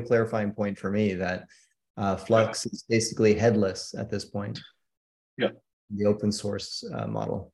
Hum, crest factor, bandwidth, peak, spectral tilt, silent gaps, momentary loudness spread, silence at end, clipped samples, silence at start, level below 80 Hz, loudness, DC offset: none; 20 dB; 12 kHz; -8 dBFS; -5.5 dB/octave; 1.90-1.94 s, 4.97-5.37 s, 5.73-5.88 s; 12 LU; 0.05 s; under 0.1%; 0 s; -60 dBFS; -27 LUFS; under 0.1%